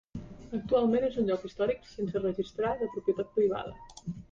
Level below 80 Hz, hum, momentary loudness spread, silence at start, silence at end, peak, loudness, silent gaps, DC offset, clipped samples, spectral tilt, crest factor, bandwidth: -56 dBFS; none; 15 LU; 0.15 s; 0.1 s; -16 dBFS; -31 LUFS; none; under 0.1%; under 0.1%; -7.5 dB/octave; 16 dB; 7.8 kHz